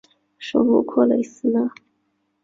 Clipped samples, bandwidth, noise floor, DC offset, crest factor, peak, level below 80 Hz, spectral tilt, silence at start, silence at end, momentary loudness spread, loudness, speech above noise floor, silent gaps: under 0.1%; 7.6 kHz; -70 dBFS; under 0.1%; 18 dB; -4 dBFS; -66 dBFS; -6.5 dB/octave; 0.4 s; 0.75 s; 8 LU; -20 LUFS; 51 dB; none